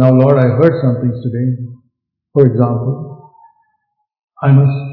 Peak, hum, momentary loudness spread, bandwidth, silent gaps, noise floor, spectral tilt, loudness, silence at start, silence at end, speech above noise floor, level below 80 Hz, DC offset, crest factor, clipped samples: 0 dBFS; none; 14 LU; 4.5 kHz; 4.24-4.28 s; -67 dBFS; -12 dB/octave; -13 LUFS; 0 s; 0 s; 56 dB; -56 dBFS; under 0.1%; 14 dB; 0.3%